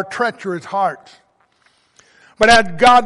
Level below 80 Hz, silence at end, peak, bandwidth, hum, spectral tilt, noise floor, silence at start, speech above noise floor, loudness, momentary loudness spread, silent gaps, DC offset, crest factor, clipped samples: -44 dBFS; 0 s; 0 dBFS; 11.5 kHz; none; -3 dB/octave; -58 dBFS; 0 s; 44 dB; -15 LUFS; 14 LU; none; under 0.1%; 16 dB; under 0.1%